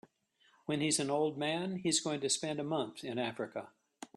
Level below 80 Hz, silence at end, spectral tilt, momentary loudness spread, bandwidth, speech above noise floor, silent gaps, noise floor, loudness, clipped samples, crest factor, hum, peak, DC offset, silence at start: -76 dBFS; 0.1 s; -3.5 dB/octave; 11 LU; 13 kHz; 36 dB; none; -71 dBFS; -35 LUFS; under 0.1%; 20 dB; none; -18 dBFS; under 0.1%; 0.7 s